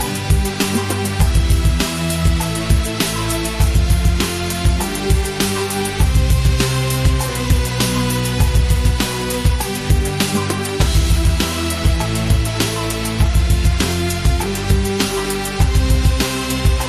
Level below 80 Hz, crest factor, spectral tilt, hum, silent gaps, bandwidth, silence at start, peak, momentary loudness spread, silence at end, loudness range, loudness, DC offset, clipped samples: -18 dBFS; 12 dB; -4.5 dB/octave; none; none; 14.5 kHz; 0 s; -2 dBFS; 4 LU; 0 s; 1 LU; -17 LUFS; 0.1%; under 0.1%